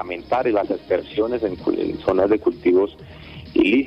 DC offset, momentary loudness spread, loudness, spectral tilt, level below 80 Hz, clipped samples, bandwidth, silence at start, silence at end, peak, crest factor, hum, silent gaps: under 0.1%; 7 LU; -21 LUFS; -7.5 dB/octave; -48 dBFS; under 0.1%; 5.8 kHz; 0 s; 0 s; -6 dBFS; 14 dB; none; none